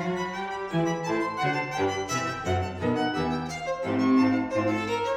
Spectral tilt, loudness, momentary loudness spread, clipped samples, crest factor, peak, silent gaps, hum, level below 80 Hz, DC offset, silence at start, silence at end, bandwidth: -5.5 dB/octave; -27 LUFS; 8 LU; under 0.1%; 14 dB; -12 dBFS; none; none; -54 dBFS; under 0.1%; 0 s; 0 s; 14.5 kHz